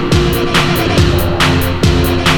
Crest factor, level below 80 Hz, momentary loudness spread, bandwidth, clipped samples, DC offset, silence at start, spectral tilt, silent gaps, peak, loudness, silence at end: 12 dB; -20 dBFS; 1 LU; over 20 kHz; under 0.1%; under 0.1%; 0 s; -5 dB/octave; none; 0 dBFS; -12 LUFS; 0 s